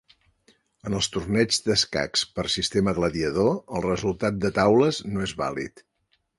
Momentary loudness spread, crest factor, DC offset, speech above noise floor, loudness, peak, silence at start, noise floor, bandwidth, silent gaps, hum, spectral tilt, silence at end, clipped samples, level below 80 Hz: 9 LU; 20 dB; under 0.1%; 39 dB; -24 LUFS; -6 dBFS; 0.85 s; -63 dBFS; 11.5 kHz; none; none; -4.5 dB/octave; 0.7 s; under 0.1%; -48 dBFS